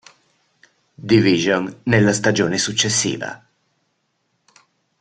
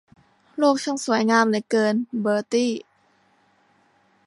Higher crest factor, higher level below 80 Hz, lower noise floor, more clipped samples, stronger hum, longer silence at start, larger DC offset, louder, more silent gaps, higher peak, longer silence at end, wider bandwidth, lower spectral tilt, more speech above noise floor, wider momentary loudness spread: about the same, 18 dB vs 20 dB; first, -54 dBFS vs -74 dBFS; first, -69 dBFS vs -62 dBFS; neither; neither; first, 1 s vs 0.55 s; neither; first, -17 LUFS vs -22 LUFS; neither; about the same, -2 dBFS vs -4 dBFS; first, 1.65 s vs 1.45 s; second, 9.4 kHz vs 11.5 kHz; about the same, -4 dB/octave vs -4.5 dB/octave; first, 52 dB vs 41 dB; first, 14 LU vs 7 LU